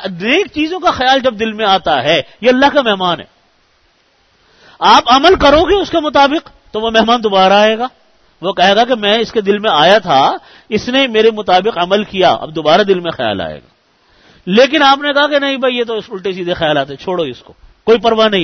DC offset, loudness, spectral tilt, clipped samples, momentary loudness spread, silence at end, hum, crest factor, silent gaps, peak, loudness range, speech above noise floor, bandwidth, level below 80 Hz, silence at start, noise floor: under 0.1%; -12 LUFS; -4.5 dB/octave; under 0.1%; 11 LU; 0 s; none; 12 dB; none; 0 dBFS; 4 LU; 43 dB; 6.6 kHz; -40 dBFS; 0 s; -54 dBFS